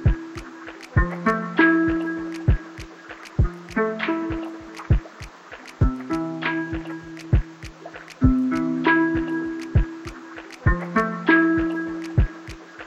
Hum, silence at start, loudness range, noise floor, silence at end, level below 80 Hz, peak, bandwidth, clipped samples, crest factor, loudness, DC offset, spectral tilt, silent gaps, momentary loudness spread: none; 0 s; 5 LU; -42 dBFS; 0 s; -30 dBFS; -4 dBFS; 9 kHz; under 0.1%; 20 dB; -23 LUFS; under 0.1%; -7.5 dB/octave; none; 20 LU